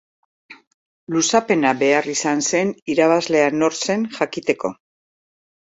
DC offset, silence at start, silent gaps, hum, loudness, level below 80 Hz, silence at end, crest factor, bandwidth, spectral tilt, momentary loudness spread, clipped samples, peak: under 0.1%; 0.5 s; 0.67-1.07 s, 2.82-2.86 s; none; -19 LUFS; -64 dBFS; 1 s; 18 dB; 8.4 kHz; -3.5 dB/octave; 6 LU; under 0.1%; -2 dBFS